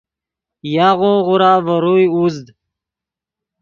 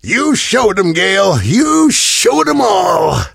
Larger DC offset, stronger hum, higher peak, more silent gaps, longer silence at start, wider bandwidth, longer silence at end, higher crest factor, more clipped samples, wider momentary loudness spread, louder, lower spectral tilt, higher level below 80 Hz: neither; neither; about the same, 0 dBFS vs 0 dBFS; neither; first, 0.65 s vs 0.05 s; second, 7 kHz vs 16 kHz; first, 1.2 s vs 0.05 s; about the same, 16 dB vs 12 dB; neither; first, 9 LU vs 3 LU; about the same, -13 LUFS vs -11 LUFS; first, -7.5 dB/octave vs -3.5 dB/octave; second, -58 dBFS vs -38 dBFS